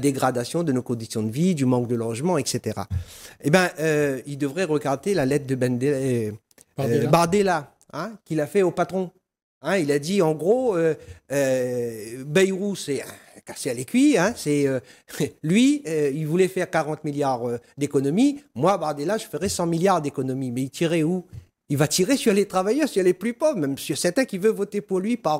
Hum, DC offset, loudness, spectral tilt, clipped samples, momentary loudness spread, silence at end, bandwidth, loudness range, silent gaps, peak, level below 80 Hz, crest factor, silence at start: none; under 0.1%; -23 LUFS; -5.5 dB/octave; under 0.1%; 10 LU; 0 s; 16 kHz; 2 LU; 9.43-9.61 s; -4 dBFS; -56 dBFS; 18 dB; 0 s